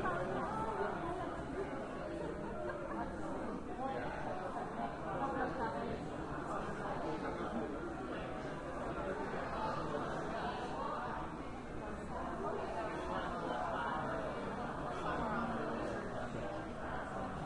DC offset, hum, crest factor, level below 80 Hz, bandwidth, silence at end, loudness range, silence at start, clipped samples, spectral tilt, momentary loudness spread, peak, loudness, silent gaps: under 0.1%; none; 16 dB; -54 dBFS; 11.5 kHz; 0 s; 2 LU; 0 s; under 0.1%; -6.5 dB/octave; 5 LU; -26 dBFS; -41 LUFS; none